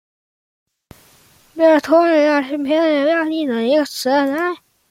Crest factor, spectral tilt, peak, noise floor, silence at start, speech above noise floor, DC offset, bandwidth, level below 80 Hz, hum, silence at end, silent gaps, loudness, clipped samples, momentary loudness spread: 16 dB; -3.5 dB/octave; -2 dBFS; -51 dBFS; 1.55 s; 36 dB; under 0.1%; 16 kHz; -66 dBFS; none; 0.35 s; none; -16 LUFS; under 0.1%; 8 LU